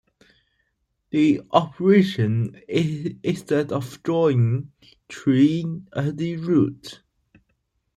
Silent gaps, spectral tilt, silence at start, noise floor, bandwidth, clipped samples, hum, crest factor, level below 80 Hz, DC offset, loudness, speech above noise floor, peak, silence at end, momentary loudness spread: none; -7.5 dB/octave; 1.15 s; -73 dBFS; 12.5 kHz; under 0.1%; none; 20 dB; -60 dBFS; under 0.1%; -22 LUFS; 52 dB; -2 dBFS; 1 s; 10 LU